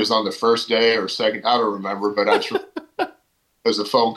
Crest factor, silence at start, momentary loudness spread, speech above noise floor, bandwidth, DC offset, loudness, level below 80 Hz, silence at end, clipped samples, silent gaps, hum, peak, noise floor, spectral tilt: 16 dB; 0 s; 10 LU; 45 dB; 12.5 kHz; under 0.1%; -20 LUFS; -68 dBFS; 0 s; under 0.1%; none; none; -4 dBFS; -64 dBFS; -3.5 dB/octave